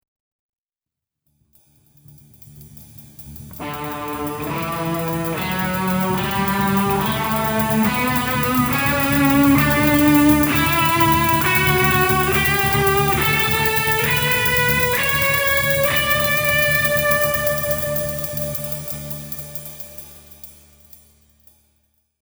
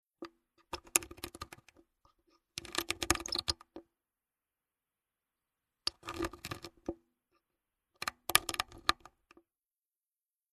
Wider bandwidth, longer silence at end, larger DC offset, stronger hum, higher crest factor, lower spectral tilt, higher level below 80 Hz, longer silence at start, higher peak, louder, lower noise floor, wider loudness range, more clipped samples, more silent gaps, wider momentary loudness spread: first, over 20 kHz vs 13.5 kHz; first, 1.75 s vs 1.6 s; neither; neither; second, 18 dB vs 36 dB; first, -4.5 dB/octave vs -1 dB/octave; first, -38 dBFS vs -58 dBFS; first, 2.45 s vs 0.2 s; first, -2 dBFS vs -6 dBFS; first, -17 LUFS vs -36 LUFS; about the same, -88 dBFS vs under -90 dBFS; first, 14 LU vs 8 LU; neither; neither; second, 13 LU vs 22 LU